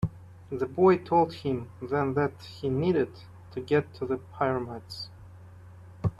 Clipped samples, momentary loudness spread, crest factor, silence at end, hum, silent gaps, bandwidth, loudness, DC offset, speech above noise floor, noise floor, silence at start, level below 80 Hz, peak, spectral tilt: under 0.1%; 17 LU; 20 dB; 0.05 s; none; none; 12 kHz; -28 LUFS; under 0.1%; 21 dB; -48 dBFS; 0 s; -56 dBFS; -10 dBFS; -8 dB/octave